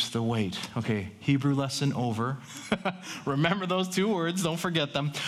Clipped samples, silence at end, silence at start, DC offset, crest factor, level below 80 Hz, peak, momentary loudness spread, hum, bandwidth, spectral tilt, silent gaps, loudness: under 0.1%; 0 s; 0 s; under 0.1%; 20 dB; -62 dBFS; -8 dBFS; 6 LU; none; 15 kHz; -5 dB/octave; none; -29 LUFS